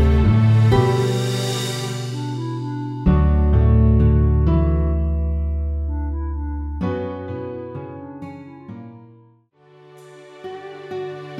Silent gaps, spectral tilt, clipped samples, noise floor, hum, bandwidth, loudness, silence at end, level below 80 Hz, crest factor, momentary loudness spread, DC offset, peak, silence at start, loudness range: none; -7 dB/octave; under 0.1%; -53 dBFS; none; 12 kHz; -20 LUFS; 0 s; -24 dBFS; 14 dB; 20 LU; under 0.1%; -4 dBFS; 0 s; 18 LU